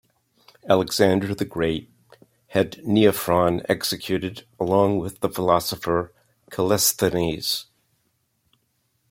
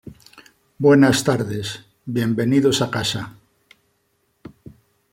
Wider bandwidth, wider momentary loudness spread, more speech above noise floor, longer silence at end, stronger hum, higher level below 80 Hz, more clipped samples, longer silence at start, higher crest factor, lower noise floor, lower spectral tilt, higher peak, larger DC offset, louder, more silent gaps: about the same, 16.5 kHz vs 16.5 kHz; second, 9 LU vs 16 LU; about the same, 48 dB vs 49 dB; second, 1.5 s vs 1.8 s; neither; about the same, -54 dBFS vs -56 dBFS; neither; first, 0.65 s vs 0.05 s; about the same, 20 dB vs 18 dB; about the same, -70 dBFS vs -67 dBFS; about the same, -4.5 dB/octave vs -5 dB/octave; about the same, -4 dBFS vs -2 dBFS; neither; second, -22 LUFS vs -19 LUFS; neither